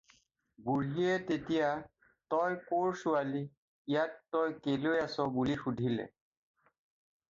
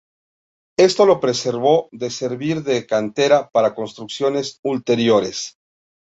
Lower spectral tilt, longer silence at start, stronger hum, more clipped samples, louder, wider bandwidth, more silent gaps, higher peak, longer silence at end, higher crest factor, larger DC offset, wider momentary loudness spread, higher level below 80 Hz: first, -7 dB/octave vs -4.5 dB/octave; second, 0.6 s vs 0.8 s; neither; neither; second, -34 LUFS vs -18 LUFS; about the same, 7.6 kHz vs 8 kHz; first, 3.57-3.85 s vs 4.59-4.63 s; second, -18 dBFS vs -2 dBFS; first, 1.2 s vs 0.65 s; about the same, 16 dB vs 16 dB; neither; second, 8 LU vs 12 LU; second, -68 dBFS vs -62 dBFS